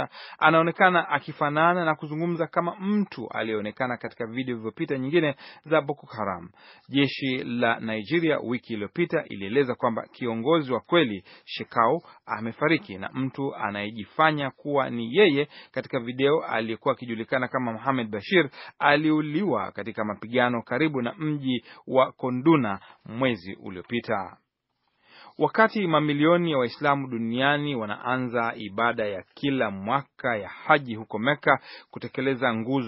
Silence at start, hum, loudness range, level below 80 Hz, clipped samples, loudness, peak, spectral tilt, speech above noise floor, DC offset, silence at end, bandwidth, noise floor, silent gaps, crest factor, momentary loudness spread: 0 s; none; 4 LU; -70 dBFS; under 0.1%; -25 LUFS; -4 dBFS; -4 dB/octave; 51 dB; under 0.1%; 0 s; 5.8 kHz; -76 dBFS; none; 22 dB; 11 LU